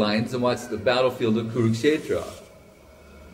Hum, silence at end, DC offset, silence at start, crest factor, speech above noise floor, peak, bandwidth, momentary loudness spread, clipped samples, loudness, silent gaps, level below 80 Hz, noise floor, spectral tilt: none; 0 s; under 0.1%; 0 s; 18 dB; 26 dB; -8 dBFS; 16 kHz; 8 LU; under 0.1%; -24 LUFS; none; -56 dBFS; -49 dBFS; -6 dB/octave